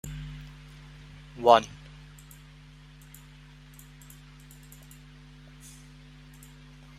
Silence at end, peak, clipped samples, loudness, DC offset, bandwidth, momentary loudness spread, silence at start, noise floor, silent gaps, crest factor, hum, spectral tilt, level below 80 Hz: 5.25 s; -4 dBFS; under 0.1%; -24 LUFS; under 0.1%; 16 kHz; 28 LU; 0.05 s; -50 dBFS; none; 28 dB; 50 Hz at -50 dBFS; -4.5 dB/octave; -52 dBFS